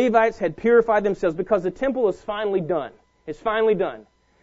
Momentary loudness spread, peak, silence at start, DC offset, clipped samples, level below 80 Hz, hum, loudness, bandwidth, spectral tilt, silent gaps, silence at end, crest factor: 10 LU; -4 dBFS; 0 s; under 0.1%; under 0.1%; -52 dBFS; none; -22 LUFS; 7.8 kHz; -7 dB/octave; none; 0.4 s; 18 dB